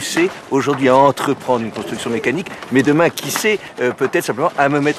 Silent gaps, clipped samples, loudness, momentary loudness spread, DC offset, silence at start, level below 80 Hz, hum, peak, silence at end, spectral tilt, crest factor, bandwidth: none; under 0.1%; -17 LUFS; 8 LU; under 0.1%; 0 s; -58 dBFS; none; 0 dBFS; 0 s; -4.5 dB/octave; 16 dB; 15 kHz